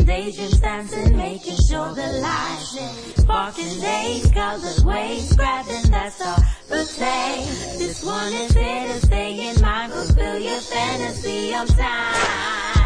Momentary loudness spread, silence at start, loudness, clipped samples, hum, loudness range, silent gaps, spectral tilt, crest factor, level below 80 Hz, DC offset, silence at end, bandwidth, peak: 6 LU; 0 s; -21 LUFS; under 0.1%; none; 2 LU; none; -5 dB/octave; 16 dB; -22 dBFS; under 0.1%; 0 s; 10.5 kHz; -4 dBFS